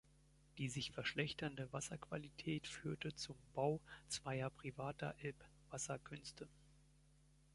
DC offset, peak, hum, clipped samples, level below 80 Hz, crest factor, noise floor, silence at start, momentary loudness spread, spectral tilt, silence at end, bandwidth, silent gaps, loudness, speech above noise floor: under 0.1%; -24 dBFS; none; under 0.1%; -70 dBFS; 24 dB; -71 dBFS; 0.55 s; 11 LU; -4.5 dB/octave; 0.7 s; 11.5 kHz; none; -47 LUFS; 24 dB